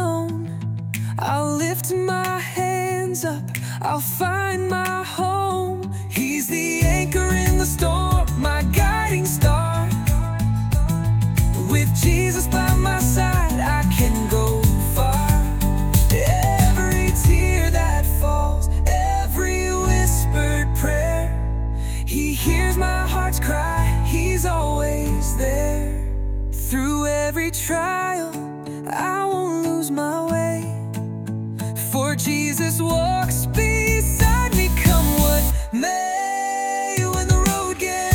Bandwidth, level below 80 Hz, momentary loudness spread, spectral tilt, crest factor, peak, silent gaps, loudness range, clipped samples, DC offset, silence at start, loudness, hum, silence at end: 18 kHz; -24 dBFS; 8 LU; -5 dB/octave; 16 dB; -2 dBFS; none; 5 LU; under 0.1%; under 0.1%; 0 s; -21 LUFS; none; 0 s